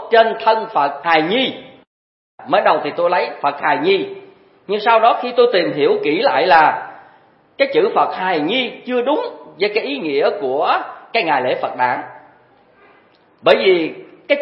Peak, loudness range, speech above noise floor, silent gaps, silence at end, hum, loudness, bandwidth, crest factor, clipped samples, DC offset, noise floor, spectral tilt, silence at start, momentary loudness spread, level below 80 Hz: 0 dBFS; 4 LU; 36 dB; 1.87-2.38 s; 0 s; none; -16 LUFS; 5.8 kHz; 18 dB; under 0.1%; under 0.1%; -52 dBFS; -7 dB/octave; 0 s; 9 LU; -68 dBFS